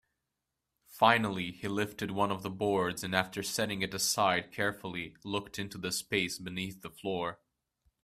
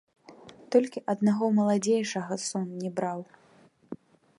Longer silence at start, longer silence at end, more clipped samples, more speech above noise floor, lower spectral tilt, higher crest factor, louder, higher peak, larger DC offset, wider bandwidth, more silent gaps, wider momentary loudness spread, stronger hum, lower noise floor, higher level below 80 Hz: first, 0.9 s vs 0.3 s; first, 0.7 s vs 0.45 s; neither; first, 54 dB vs 33 dB; second, -3.5 dB/octave vs -5.5 dB/octave; first, 26 dB vs 20 dB; second, -32 LUFS vs -28 LUFS; about the same, -8 dBFS vs -10 dBFS; neither; first, 15.5 kHz vs 11.5 kHz; neither; second, 12 LU vs 20 LU; neither; first, -86 dBFS vs -60 dBFS; first, -66 dBFS vs -78 dBFS